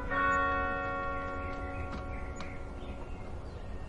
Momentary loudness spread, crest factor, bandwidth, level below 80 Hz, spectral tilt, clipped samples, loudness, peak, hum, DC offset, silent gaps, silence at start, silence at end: 15 LU; 18 dB; 11 kHz; -44 dBFS; -6 dB/octave; under 0.1%; -35 LUFS; -18 dBFS; none; under 0.1%; none; 0 s; 0 s